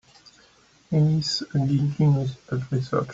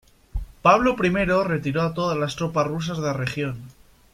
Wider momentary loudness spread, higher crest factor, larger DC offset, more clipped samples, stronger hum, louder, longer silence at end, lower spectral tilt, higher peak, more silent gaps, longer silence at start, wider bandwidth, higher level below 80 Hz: second, 7 LU vs 15 LU; about the same, 16 dB vs 20 dB; neither; neither; neither; about the same, -24 LUFS vs -22 LUFS; second, 0 s vs 0.45 s; about the same, -7 dB/octave vs -6 dB/octave; second, -10 dBFS vs -2 dBFS; neither; first, 0.9 s vs 0.35 s; second, 7.8 kHz vs 15 kHz; second, -56 dBFS vs -42 dBFS